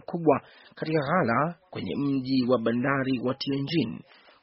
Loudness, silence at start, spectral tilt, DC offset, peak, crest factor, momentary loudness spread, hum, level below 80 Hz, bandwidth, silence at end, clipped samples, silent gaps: -27 LUFS; 0.1 s; -5 dB/octave; under 0.1%; -8 dBFS; 20 dB; 9 LU; none; -62 dBFS; 5.8 kHz; 0.45 s; under 0.1%; none